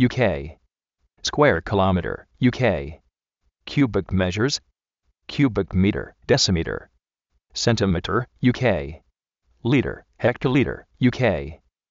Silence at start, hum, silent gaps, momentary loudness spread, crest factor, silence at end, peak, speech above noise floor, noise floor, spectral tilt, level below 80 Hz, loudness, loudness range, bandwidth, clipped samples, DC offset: 0 s; none; none; 12 LU; 18 dB; 0.35 s; -4 dBFS; 52 dB; -73 dBFS; -5 dB/octave; -42 dBFS; -22 LUFS; 2 LU; 7.6 kHz; under 0.1%; under 0.1%